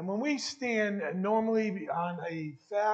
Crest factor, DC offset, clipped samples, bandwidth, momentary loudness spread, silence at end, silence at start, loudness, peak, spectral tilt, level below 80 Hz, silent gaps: 14 dB; under 0.1%; under 0.1%; 8.6 kHz; 8 LU; 0 s; 0 s; -32 LUFS; -16 dBFS; -5 dB/octave; -82 dBFS; none